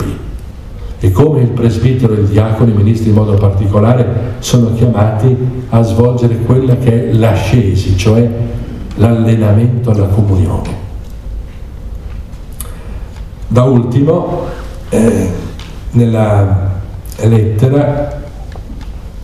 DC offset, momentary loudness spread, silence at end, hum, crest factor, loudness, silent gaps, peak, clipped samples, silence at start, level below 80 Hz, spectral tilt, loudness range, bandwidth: 0.4%; 18 LU; 0 s; none; 10 dB; -11 LUFS; none; 0 dBFS; 0.3%; 0 s; -26 dBFS; -8 dB/octave; 5 LU; 13 kHz